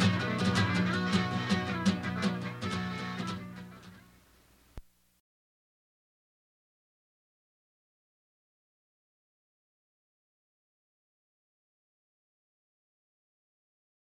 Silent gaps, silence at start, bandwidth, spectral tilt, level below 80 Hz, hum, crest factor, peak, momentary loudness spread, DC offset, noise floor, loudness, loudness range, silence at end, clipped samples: none; 0 s; 12.5 kHz; -5.5 dB/octave; -66 dBFS; none; 22 dB; -16 dBFS; 15 LU; under 0.1%; -63 dBFS; -31 LUFS; 15 LU; 9.4 s; under 0.1%